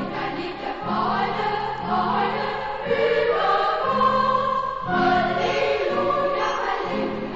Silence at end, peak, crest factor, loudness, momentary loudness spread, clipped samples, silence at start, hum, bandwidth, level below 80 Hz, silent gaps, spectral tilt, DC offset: 0 s; -8 dBFS; 14 dB; -23 LUFS; 7 LU; under 0.1%; 0 s; none; 7.8 kHz; -50 dBFS; none; -5.5 dB/octave; under 0.1%